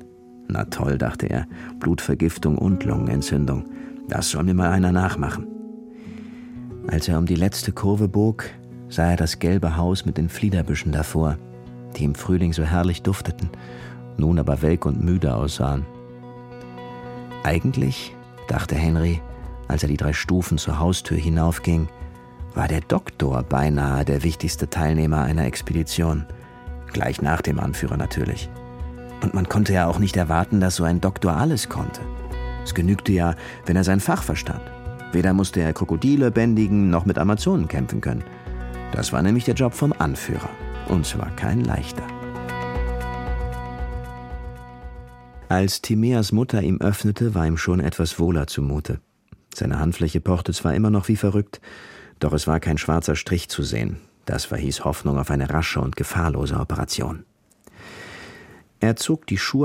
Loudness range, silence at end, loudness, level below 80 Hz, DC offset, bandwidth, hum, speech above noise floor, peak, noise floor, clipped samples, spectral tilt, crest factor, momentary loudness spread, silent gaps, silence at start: 4 LU; 0 s; -22 LUFS; -34 dBFS; under 0.1%; 16.5 kHz; none; 32 dB; -2 dBFS; -53 dBFS; under 0.1%; -6 dB/octave; 20 dB; 16 LU; none; 0 s